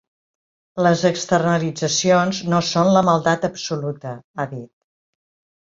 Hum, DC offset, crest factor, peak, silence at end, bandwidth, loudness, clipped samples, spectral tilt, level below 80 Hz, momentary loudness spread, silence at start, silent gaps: none; under 0.1%; 18 dB; -2 dBFS; 0.95 s; 7.8 kHz; -19 LUFS; under 0.1%; -5 dB/octave; -58 dBFS; 13 LU; 0.75 s; 4.24-4.34 s